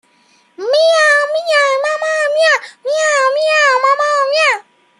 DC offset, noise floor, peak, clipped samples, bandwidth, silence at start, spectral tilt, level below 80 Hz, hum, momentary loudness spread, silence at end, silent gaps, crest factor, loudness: under 0.1%; -53 dBFS; -2 dBFS; under 0.1%; 11.5 kHz; 0.6 s; 2 dB/octave; -78 dBFS; none; 6 LU; 0.4 s; none; 12 dB; -12 LUFS